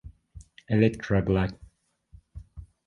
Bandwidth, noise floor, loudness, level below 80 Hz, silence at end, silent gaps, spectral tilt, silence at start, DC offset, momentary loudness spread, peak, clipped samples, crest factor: 11 kHz; -59 dBFS; -26 LUFS; -44 dBFS; 0.25 s; none; -8.5 dB/octave; 0.05 s; under 0.1%; 24 LU; -8 dBFS; under 0.1%; 22 dB